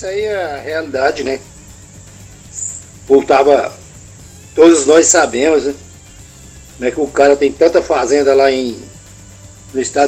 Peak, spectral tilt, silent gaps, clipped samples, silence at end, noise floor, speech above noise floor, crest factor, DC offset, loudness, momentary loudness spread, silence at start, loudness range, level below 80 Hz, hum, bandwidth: 0 dBFS; -3 dB/octave; none; 0.1%; 0 s; -38 dBFS; 26 dB; 14 dB; under 0.1%; -13 LUFS; 15 LU; 0 s; 5 LU; -44 dBFS; none; over 20 kHz